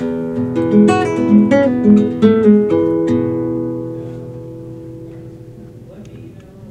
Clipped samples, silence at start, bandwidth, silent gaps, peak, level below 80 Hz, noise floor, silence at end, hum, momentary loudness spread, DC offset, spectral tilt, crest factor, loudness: under 0.1%; 0 s; 8.8 kHz; none; 0 dBFS; -48 dBFS; -35 dBFS; 0 s; none; 22 LU; under 0.1%; -8.5 dB/octave; 14 dB; -13 LUFS